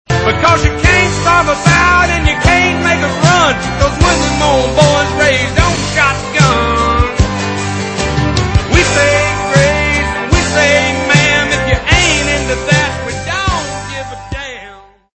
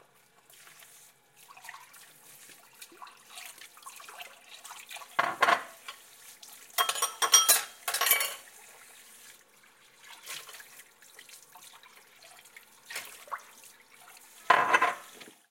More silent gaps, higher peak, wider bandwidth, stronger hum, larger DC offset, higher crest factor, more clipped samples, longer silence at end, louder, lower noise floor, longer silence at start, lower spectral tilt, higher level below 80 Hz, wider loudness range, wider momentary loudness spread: neither; first, 0 dBFS vs -6 dBFS; second, 11 kHz vs 17 kHz; neither; neither; second, 12 dB vs 28 dB; first, 0.2% vs under 0.1%; first, 0.35 s vs 0.2 s; first, -11 LUFS vs -26 LUFS; second, -36 dBFS vs -62 dBFS; second, 0.1 s vs 1.65 s; first, -4 dB/octave vs 1.5 dB/octave; first, -22 dBFS vs -86 dBFS; second, 3 LU vs 21 LU; second, 8 LU vs 27 LU